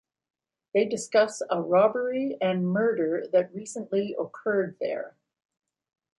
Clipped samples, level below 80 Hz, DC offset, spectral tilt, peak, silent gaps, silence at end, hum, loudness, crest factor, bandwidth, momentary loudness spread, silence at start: under 0.1%; -76 dBFS; under 0.1%; -5.5 dB/octave; -8 dBFS; none; 1.1 s; none; -26 LUFS; 18 dB; 11.5 kHz; 10 LU; 0.75 s